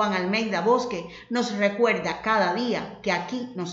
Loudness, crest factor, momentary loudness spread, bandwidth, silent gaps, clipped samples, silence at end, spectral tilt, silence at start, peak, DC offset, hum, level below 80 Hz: -25 LUFS; 16 dB; 9 LU; 8 kHz; none; under 0.1%; 0 s; -5 dB/octave; 0 s; -8 dBFS; under 0.1%; none; -62 dBFS